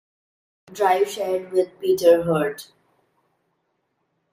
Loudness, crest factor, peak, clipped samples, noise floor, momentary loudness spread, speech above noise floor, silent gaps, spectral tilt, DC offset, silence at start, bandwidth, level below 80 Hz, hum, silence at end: -21 LUFS; 20 dB; -4 dBFS; under 0.1%; -73 dBFS; 11 LU; 52 dB; none; -5.5 dB/octave; under 0.1%; 0.7 s; 16 kHz; -64 dBFS; none; 1.7 s